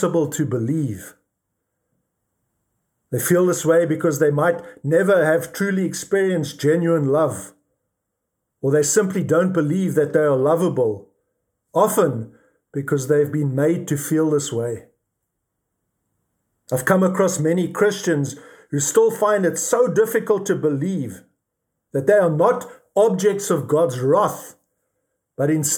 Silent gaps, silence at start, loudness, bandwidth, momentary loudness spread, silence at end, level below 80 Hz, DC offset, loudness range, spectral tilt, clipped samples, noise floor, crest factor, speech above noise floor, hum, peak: none; 0 s; -19 LUFS; 19.5 kHz; 10 LU; 0 s; -68 dBFS; under 0.1%; 4 LU; -5.5 dB/octave; under 0.1%; -78 dBFS; 18 dB; 59 dB; none; -2 dBFS